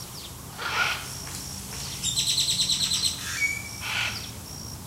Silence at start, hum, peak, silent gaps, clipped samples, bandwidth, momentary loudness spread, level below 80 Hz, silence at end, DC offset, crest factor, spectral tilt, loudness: 0 s; none; -12 dBFS; none; under 0.1%; 16 kHz; 15 LU; -50 dBFS; 0 s; under 0.1%; 18 dB; -0.5 dB/octave; -26 LUFS